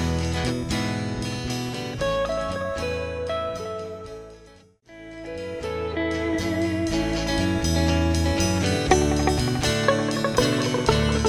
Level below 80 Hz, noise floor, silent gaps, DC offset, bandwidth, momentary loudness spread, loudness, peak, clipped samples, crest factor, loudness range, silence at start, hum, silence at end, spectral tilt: -34 dBFS; -51 dBFS; none; under 0.1%; 16 kHz; 12 LU; -24 LUFS; -4 dBFS; under 0.1%; 20 dB; 9 LU; 0 s; none; 0 s; -5 dB/octave